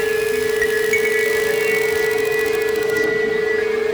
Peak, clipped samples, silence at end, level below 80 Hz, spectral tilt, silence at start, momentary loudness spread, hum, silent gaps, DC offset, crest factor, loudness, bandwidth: -6 dBFS; under 0.1%; 0 s; -50 dBFS; -2.5 dB/octave; 0 s; 2 LU; none; none; under 0.1%; 12 dB; -18 LUFS; over 20 kHz